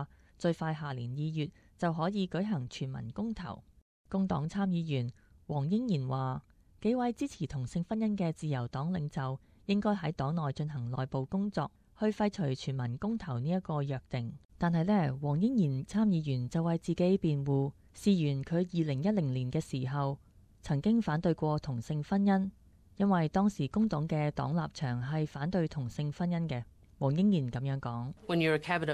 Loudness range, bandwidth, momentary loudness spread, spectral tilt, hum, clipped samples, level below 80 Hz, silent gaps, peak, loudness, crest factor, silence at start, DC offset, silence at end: 4 LU; 10.5 kHz; 9 LU; -7.5 dB/octave; none; under 0.1%; -58 dBFS; 3.82-4.05 s, 14.45-14.49 s; -14 dBFS; -33 LUFS; 18 dB; 0 s; under 0.1%; 0 s